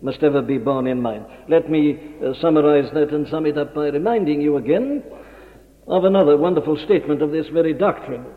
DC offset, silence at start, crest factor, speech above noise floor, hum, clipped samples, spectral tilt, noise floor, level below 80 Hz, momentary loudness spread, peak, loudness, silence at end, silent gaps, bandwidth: under 0.1%; 0 s; 16 dB; 27 dB; none; under 0.1%; -8.5 dB/octave; -45 dBFS; -52 dBFS; 10 LU; -4 dBFS; -19 LUFS; 0 s; none; 5 kHz